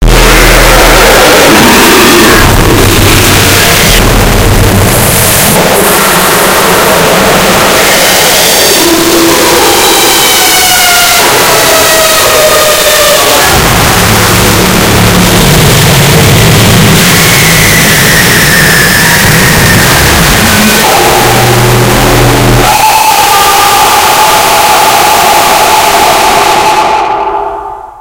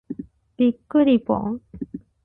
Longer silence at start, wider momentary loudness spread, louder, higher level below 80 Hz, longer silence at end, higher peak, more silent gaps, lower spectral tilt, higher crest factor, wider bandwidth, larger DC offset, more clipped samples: about the same, 0 s vs 0.1 s; second, 3 LU vs 18 LU; first, -3 LUFS vs -21 LUFS; first, -16 dBFS vs -54 dBFS; second, 0 s vs 0.3 s; first, 0 dBFS vs -6 dBFS; neither; second, -3 dB/octave vs -10 dB/octave; second, 4 dB vs 16 dB; first, over 20 kHz vs 4 kHz; neither; first, 20% vs under 0.1%